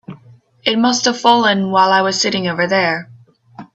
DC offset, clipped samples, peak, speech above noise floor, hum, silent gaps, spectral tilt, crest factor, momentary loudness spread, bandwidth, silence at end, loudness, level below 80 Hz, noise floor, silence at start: under 0.1%; under 0.1%; 0 dBFS; 31 dB; none; none; -3.5 dB/octave; 16 dB; 6 LU; 8.4 kHz; 0.1 s; -14 LUFS; -60 dBFS; -45 dBFS; 0.1 s